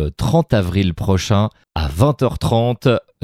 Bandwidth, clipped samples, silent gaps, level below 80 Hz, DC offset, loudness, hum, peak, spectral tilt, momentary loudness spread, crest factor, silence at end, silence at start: 15.5 kHz; under 0.1%; none; -32 dBFS; under 0.1%; -17 LUFS; none; 0 dBFS; -6.5 dB/octave; 4 LU; 16 dB; 0.25 s; 0 s